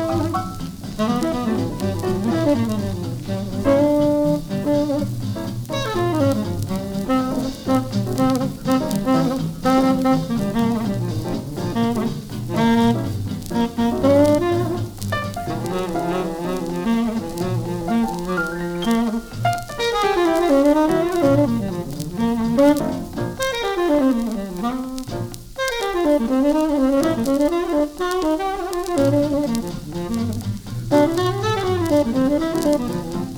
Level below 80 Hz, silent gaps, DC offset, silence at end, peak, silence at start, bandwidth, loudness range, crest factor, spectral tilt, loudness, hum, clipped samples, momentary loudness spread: -40 dBFS; none; under 0.1%; 0 s; -4 dBFS; 0 s; over 20 kHz; 4 LU; 16 dB; -6.5 dB/octave; -21 LUFS; none; under 0.1%; 9 LU